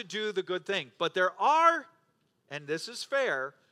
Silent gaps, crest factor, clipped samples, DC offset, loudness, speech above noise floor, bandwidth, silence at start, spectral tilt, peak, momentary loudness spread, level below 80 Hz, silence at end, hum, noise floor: none; 20 dB; under 0.1%; under 0.1%; -29 LUFS; 43 dB; 13.5 kHz; 0 s; -3 dB/octave; -10 dBFS; 12 LU; -90 dBFS; 0.2 s; none; -73 dBFS